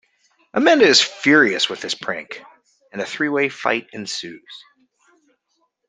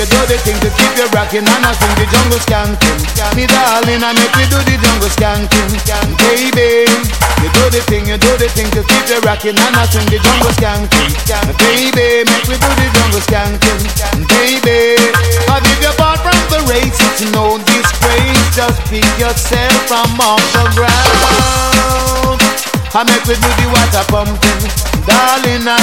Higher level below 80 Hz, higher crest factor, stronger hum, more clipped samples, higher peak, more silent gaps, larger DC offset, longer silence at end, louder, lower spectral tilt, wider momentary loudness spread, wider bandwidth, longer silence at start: second, -68 dBFS vs -18 dBFS; first, 20 dB vs 10 dB; neither; second, under 0.1% vs 0.3%; about the same, 0 dBFS vs 0 dBFS; neither; second, under 0.1% vs 1%; first, 1.3 s vs 0 s; second, -18 LUFS vs -10 LUFS; about the same, -2.5 dB/octave vs -3.5 dB/octave; first, 22 LU vs 4 LU; second, 9.8 kHz vs 17.5 kHz; first, 0.55 s vs 0 s